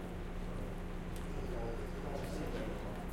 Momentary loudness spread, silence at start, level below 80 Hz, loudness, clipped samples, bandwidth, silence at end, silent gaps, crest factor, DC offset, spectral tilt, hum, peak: 3 LU; 0 s; -44 dBFS; -43 LUFS; under 0.1%; 16.5 kHz; 0 s; none; 12 dB; under 0.1%; -6.5 dB/octave; none; -28 dBFS